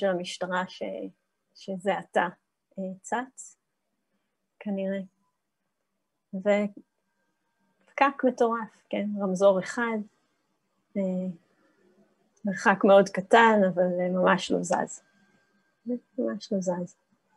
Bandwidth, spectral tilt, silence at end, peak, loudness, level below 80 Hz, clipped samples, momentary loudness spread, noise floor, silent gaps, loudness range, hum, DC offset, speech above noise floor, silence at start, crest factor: 11.5 kHz; -5.5 dB/octave; 0.5 s; -6 dBFS; -26 LUFS; -78 dBFS; under 0.1%; 20 LU; -82 dBFS; none; 11 LU; none; under 0.1%; 56 dB; 0 s; 22 dB